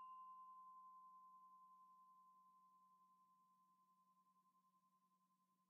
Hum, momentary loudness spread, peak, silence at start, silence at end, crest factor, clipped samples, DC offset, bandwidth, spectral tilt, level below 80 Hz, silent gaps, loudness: none; 8 LU; -54 dBFS; 0 s; 0 s; 14 dB; under 0.1%; under 0.1%; 2.8 kHz; -1.5 dB/octave; under -90 dBFS; none; -64 LUFS